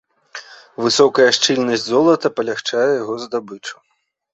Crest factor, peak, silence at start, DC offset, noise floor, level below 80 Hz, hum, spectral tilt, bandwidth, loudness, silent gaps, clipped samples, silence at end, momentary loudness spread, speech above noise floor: 18 dB; 0 dBFS; 0.35 s; under 0.1%; -38 dBFS; -62 dBFS; none; -3 dB/octave; 8.2 kHz; -16 LUFS; none; under 0.1%; 0.6 s; 22 LU; 22 dB